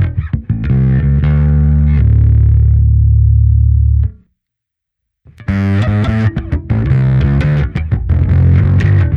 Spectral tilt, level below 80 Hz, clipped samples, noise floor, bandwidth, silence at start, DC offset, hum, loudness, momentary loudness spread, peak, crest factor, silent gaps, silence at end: -10 dB/octave; -16 dBFS; under 0.1%; -78 dBFS; 4.8 kHz; 0 s; under 0.1%; none; -12 LUFS; 7 LU; 0 dBFS; 10 dB; none; 0 s